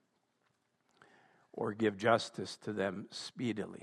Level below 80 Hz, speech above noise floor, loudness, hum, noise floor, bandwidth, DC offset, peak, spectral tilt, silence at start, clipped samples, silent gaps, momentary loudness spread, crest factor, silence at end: -82 dBFS; 43 dB; -36 LUFS; none; -78 dBFS; 12 kHz; under 0.1%; -14 dBFS; -5 dB/octave; 1.55 s; under 0.1%; none; 12 LU; 24 dB; 0 s